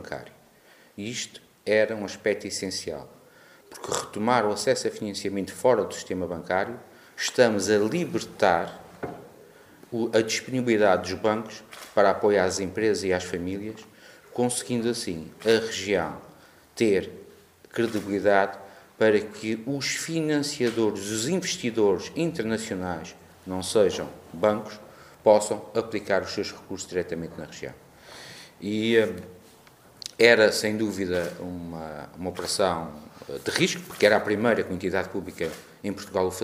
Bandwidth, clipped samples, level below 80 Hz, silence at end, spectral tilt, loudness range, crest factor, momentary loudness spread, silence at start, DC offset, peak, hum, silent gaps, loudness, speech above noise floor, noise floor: 15.5 kHz; under 0.1%; -62 dBFS; 0 s; -4 dB/octave; 5 LU; 26 dB; 17 LU; 0 s; under 0.1%; 0 dBFS; none; none; -26 LUFS; 30 dB; -56 dBFS